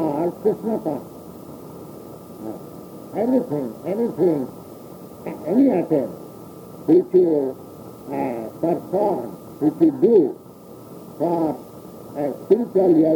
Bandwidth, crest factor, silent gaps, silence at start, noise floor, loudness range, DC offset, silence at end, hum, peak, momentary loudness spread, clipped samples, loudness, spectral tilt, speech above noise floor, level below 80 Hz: 19.5 kHz; 18 dB; none; 0 s; -41 dBFS; 6 LU; under 0.1%; 0 s; none; -4 dBFS; 22 LU; under 0.1%; -21 LUFS; -9 dB/octave; 22 dB; -62 dBFS